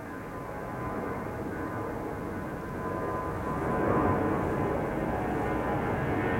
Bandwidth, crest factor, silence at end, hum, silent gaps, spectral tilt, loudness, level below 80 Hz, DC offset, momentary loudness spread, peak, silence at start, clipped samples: 16.5 kHz; 18 dB; 0 s; none; none; -8 dB/octave; -32 LUFS; -46 dBFS; under 0.1%; 9 LU; -14 dBFS; 0 s; under 0.1%